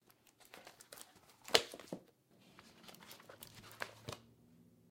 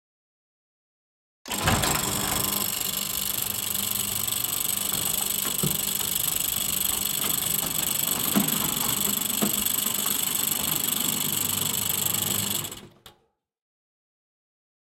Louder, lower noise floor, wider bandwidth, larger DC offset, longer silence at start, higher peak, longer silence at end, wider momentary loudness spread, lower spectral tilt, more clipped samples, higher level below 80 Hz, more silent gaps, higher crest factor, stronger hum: second, -39 LUFS vs -24 LUFS; about the same, -68 dBFS vs -69 dBFS; about the same, 17 kHz vs 17 kHz; neither; second, 0.4 s vs 1.45 s; about the same, -6 dBFS vs -8 dBFS; second, 0.7 s vs 1.75 s; first, 25 LU vs 3 LU; about the same, -1.5 dB/octave vs -1.5 dB/octave; neither; second, -78 dBFS vs -52 dBFS; neither; first, 40 dB vs 20 dB; neither